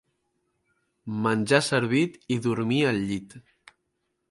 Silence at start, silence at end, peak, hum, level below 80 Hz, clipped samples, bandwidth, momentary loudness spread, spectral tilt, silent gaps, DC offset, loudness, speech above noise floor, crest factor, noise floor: 1.05 s; 0.9 s; -4 dBFS; none; -62 dBFS; under 0.1%; 11.5 kHz; 12 LU; -5.5 dB/octave; none; under 0.1%; -25 LUFS; 52 dB; 24 dB; -77 dBFS